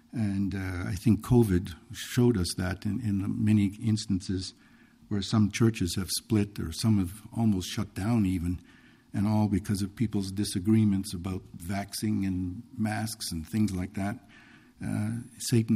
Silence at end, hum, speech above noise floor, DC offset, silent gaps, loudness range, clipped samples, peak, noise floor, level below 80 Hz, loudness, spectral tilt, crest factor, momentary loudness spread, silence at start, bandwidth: 0 s; none; 27 dB; under 0.1%; none; 5 LU; under 0.1%; -10 dBFS; -55 dBFS; -52 dBFS; -29 LUFS; -6 dB/octave; 18 dB; 10 LU; 0.15 s; 15.5 kHz